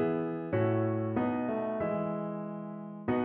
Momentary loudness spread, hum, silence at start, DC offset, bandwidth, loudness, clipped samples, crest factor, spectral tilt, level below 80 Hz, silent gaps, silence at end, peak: 9 LU; none; 0 s; under 0.1%; 4.1 kHz; -33 LUFS; under 0.1%; 14 dB; -8 dB/octave; -64 dBFS; none; 0 s; -18 dBFS